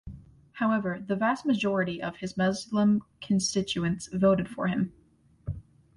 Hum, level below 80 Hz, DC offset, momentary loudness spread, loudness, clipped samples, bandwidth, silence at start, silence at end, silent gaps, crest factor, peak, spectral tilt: none; -54 dBFS; under 0.1%; 14 LU; -28 LUFS; under 0.1%; 11.5 kHz; 0.05 s; 0.35 s; none; 18 dB; -12 dBFS; -5.5 dB/octave